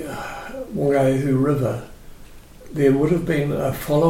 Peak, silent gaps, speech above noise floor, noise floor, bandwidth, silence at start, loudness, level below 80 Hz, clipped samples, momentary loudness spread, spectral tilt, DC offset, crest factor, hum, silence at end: -4 dBFS; none; 23 dB; -41 dBFS; 16.5 kHz; 0 s; -21 LUFS; -42 dBFS; under 0.1%; 14 LU; -7.5 dB/octave; under 0.1%; 16 dB; none; 0 s